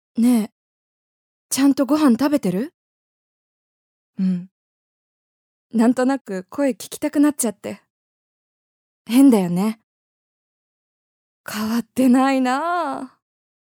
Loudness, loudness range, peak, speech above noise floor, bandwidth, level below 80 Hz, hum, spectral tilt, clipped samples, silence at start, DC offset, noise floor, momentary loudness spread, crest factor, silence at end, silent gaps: -19 LUFS; 4 LU; -4 dBFS; over 72 dB; 19 kHz; -70 dBFS; none; -5.5 dB/octave; under 0.1%; 0.15 s; under 0.1%; under -90 dBFS; 17 LU; 18 dB; 0.65 s; 0.52-1.49 s, 2.74-4.13 s, 4.51-5.70 s, 6.21-6.25 s, 7.90-9.05 s, 9.83-11.44 s